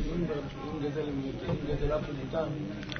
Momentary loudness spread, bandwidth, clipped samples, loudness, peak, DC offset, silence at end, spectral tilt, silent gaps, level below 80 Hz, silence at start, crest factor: 4 LU; 6.6 kHz; under 0.1%; -34 LUFS; -18 dBFS; under 0.1%; 0 s; -7.5 dB/octave; none; -42 dBFS; 0 s; 16 dB